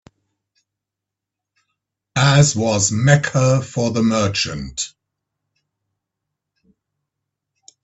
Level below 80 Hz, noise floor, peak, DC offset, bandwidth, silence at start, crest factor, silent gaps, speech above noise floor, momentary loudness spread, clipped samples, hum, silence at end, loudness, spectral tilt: -50 dBFS; -84 dBFS; 0 dBFS; under 0.1%; 8.4 kHz; 2.15 s; 20 dB; none; 68 dB; 12 LU; under 0.1%; none; 2.95 s; -17 LUFS; -4.5 dB/octave